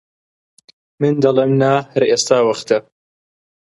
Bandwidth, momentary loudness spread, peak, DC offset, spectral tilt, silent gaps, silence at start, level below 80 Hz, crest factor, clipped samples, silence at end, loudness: 11.5 kHz; 6 LU; 0 dBFS; under 0.1%; -5 dB/octave; none; 1 s; -64 dBFS; 16 dB; under 0.1%; 0.95 s; -15 LUFS